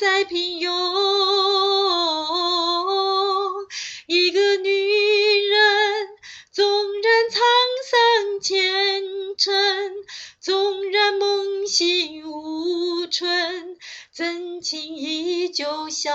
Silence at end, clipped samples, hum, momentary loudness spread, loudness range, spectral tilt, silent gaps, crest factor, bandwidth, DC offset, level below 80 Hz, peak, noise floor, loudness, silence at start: 0 s; under 0.1%; none; 13 LU; 6 LU; 0 dB/octave; none; 16 dB; 8 kHz; under 0.1%; -74 dBFS; -4 dBFS; -42 dBFS; -20 LUFS; 0 s